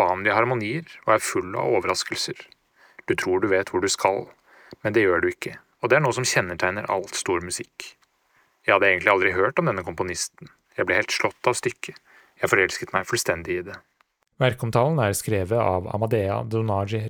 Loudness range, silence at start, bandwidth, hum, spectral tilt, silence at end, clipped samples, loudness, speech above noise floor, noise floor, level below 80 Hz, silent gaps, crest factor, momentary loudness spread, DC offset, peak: 3 LU; 0 s; over 20 kHz; none; -4.5 dB/octave; 0 s; under 0.1%; -23 LUFS; 44 dB; -67 dBFS; -60 dBFS; none; 22 dB; 11 LU; under 0.1%; -2 dBFS